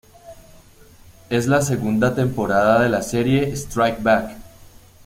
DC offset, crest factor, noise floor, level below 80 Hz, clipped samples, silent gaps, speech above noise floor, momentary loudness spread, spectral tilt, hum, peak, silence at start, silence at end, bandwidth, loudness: under 0.1%; 18 dB; -47 dBFS; -44 dBFS; under 0.1%; none; 29 dB; 6 LU; -6 dB/octave; none; -4 dBFS; 0.25 s; 0.4 s; 16.5 kHz; -19 LUFS